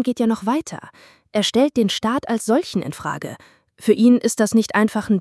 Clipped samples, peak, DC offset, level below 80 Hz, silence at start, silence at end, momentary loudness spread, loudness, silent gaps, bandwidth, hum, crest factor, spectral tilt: under 0.1%; -2 dBFS; under 0.1%; -60 dBFS; 0 s; 0 s; 12 LU; -19 LUFS; none; 12 kHz; none; 16 dB; -4.5 dB/octave